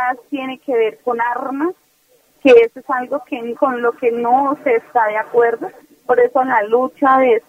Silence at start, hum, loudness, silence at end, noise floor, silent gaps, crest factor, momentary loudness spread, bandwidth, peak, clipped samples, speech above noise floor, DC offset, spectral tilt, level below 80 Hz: 0 s; none; -16 LUFS; 0.1 s; -56 dBFS; none; 16 dB; 12 LU; 6.4 kHz; 0 dBFS; under 0.1%; 41 dB; under 0.1%; -5.5 dB/octave; -64 dBFS